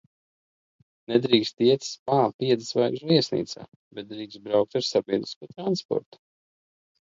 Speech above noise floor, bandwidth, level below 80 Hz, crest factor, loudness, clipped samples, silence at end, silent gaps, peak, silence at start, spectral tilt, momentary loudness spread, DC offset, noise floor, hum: over 65 dB; 7.8 kHz; -70 dBFS; 24 dB; -25 LUFS; under 0.1%; 1.2 s; 1.99-2.06 s, 2.34-2.39 s, 3.76-3.91 s, 5.36-5.41 s, 5.85-5.89 s; -4 dBFS; 1.1 s; -5.5 dB/octave; 16 LU; under 0.1%; under -90 dBFS; none